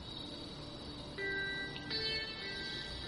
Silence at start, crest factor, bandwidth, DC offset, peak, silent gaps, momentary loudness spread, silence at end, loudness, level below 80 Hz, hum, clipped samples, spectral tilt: 0 s; 16 dB; 11.5 kHz; under 0.1%; -26 dBFS; none; 10 LU; 0 s; -40 LUFS; -56 dBFS; none; under 0.1%; -4 dB/octave